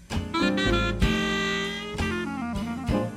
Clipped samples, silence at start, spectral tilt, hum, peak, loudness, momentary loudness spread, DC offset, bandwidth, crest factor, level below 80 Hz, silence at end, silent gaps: under 0.1%; 0 s; -5 dB/octave; none; -10 dBFS; -26 LUFS; 7 LU; under 0.1%; 15.5 kHz; 18 dB; -36 dBFS; 0 s; none